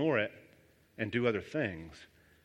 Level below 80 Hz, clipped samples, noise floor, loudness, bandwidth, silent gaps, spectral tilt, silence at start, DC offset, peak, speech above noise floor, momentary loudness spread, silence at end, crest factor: -66 dBFS; under 0.1%; -64 dBFS; -34 LUFS; 11.5 kHz; none; -7 dB/octave; 0 s; under 0.1%; -14 dBFS; 31 dB; 21 LU; 0.4 s; 20 dB